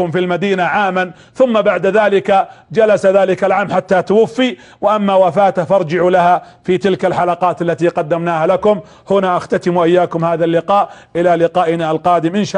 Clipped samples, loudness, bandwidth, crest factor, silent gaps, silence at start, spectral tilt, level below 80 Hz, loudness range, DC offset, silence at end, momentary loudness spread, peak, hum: under 0.1%; -14 LUFS; 10 kHz; 12 dB; none; 0 s; -6.5 dB/octave; -54 dBFS; 2 LU; under 0.1%; 0 s; 5 LU; -2 dBFS; none